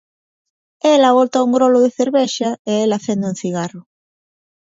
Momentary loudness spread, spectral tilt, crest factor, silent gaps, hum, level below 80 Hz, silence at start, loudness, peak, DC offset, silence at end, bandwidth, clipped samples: 10 LU; -5 dB/octave; 16 dB; 2.59-2.65 s; none; -66 dBFS; 0.85 s; -16 LUFS; 0 dBFS; under 0.1%; 0.95 s; 7.8 kHz; under 0.1%